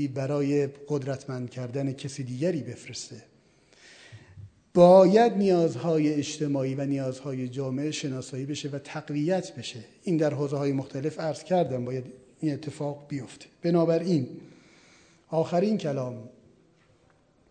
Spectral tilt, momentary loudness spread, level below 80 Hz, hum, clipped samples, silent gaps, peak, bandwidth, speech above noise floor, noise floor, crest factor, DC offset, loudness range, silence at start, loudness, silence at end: -6.5 dB/octave; 15 LU; -68 dBFS; none; under 0.1%; none; -4 dBFS; 9.4 kHz; 37 dB; -63 dBFS; 22 dB; under 0.1%; 10 LU; 0 s; -27 LUFS; 1.2 s